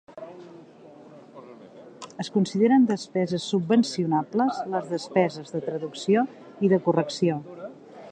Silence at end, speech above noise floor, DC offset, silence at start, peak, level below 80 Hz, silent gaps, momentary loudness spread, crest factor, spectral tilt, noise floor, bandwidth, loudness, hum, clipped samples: 0 s; 24 dB; under 0.1%; 0.1 s; -8 dBFS; -72 dBFS; none; 21 LU; 18 dB; -6.5 dB/octave; -48 dBFS; 9.4 kHz; -25 LUFS; none; under 0.1%